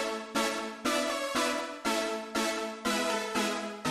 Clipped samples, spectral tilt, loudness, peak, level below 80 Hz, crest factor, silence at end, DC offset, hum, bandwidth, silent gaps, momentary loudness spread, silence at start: under 0.1%; -2 dB/octave; -31 LUFS; -16 dBFS; -64 dBFS; 16 dB; 0 s; under 0.1%; none; 16 kHz; none; 3 LU; 0 s